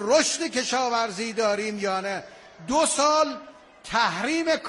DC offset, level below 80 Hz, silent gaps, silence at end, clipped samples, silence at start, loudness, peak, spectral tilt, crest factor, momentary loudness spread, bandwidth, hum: under 0.1%; -60 dBFS; none; 0 s; under 0.1%; 0 s; -24 LUFS; -8 dBFS; -2 dB/octave; 18 dB; 11 LU; 11.5 kHz; none